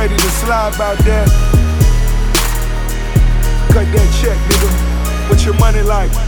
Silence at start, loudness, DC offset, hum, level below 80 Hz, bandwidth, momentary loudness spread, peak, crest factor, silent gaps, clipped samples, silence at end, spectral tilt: 0 s; -14 LUFS; under 0.1%; none; -12 dBFS; over 20 kHz; 5 LU; 0 dBFS; 10 dB; none; under 0.1%; 0 s; -5 dB/octave